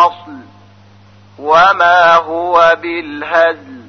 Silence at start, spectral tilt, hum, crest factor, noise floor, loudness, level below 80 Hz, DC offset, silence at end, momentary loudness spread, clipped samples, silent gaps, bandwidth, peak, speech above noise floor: 0 s; -4 dB/octave; none; 12 dB; -42 dBFS; -10 LUFS; -52 dBFS; under 0.1%; 0.05 s; 13 LU; under 0.1%; none; 6.6 kHz; 0 dBFS; 32 dB